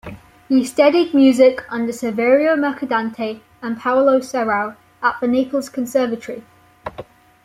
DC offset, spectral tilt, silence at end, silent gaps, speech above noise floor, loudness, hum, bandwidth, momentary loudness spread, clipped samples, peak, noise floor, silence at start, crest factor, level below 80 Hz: under 0.1%; -5 dB/octave; 0.45 s; none; 22 dB; -17 LUFS; none; 15 kHz; 19 LU; under 0.1%; -2 dBFS; -38 dBFS; 0.05 s; 16 dB; -56 dBFS